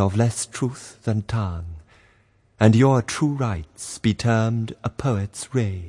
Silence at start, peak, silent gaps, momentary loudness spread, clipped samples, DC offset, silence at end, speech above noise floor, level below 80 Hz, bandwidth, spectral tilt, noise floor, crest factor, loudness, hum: 0 s; -2 dBFS; none; 14 LU; under 0.1%; under 0.1%; 0 s; 38 dB; -48 dBFS; 11.5 kHz; -6.5 dB/octave; -59 dBFS; 20 dB; -22 LUFS; none